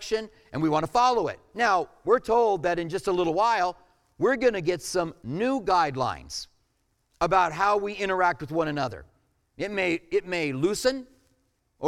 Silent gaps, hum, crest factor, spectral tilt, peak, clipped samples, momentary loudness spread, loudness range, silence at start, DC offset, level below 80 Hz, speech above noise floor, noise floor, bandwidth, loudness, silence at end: none; none; 18 dB; -4.5 dB/octave; -8 dBFS; under 0.1%; 10 LU; 3 LU; 0 s; under 0.1%; -54 dBFS; 46 dB; -72 dBFS; 15.5 kHz; -26 LUFS; 0 s